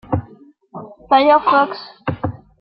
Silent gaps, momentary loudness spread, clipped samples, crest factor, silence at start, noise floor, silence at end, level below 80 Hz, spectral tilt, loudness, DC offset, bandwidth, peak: none; 24 LU; under 0.1%; 16 dB; 0.1 s; -46 dBFS; 0.25 s; -48 dBFS; -10 dB/octave; -17 LUFS; under 0.1%; 5.6 kHz; -2 dBFS